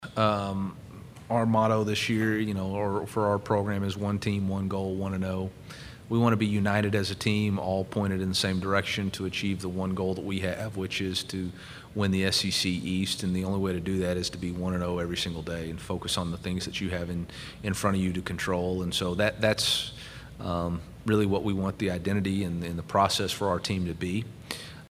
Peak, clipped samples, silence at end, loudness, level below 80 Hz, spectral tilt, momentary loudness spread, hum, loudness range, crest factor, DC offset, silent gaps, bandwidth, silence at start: -8 dBFS; under 0.1%; 0.05 s; -29 LUFS; -52 dBFS; -5 dB/octave; 10 LU; none; 3 LU; 20 dB; under 0.1%; none; 16 kHz; 0 s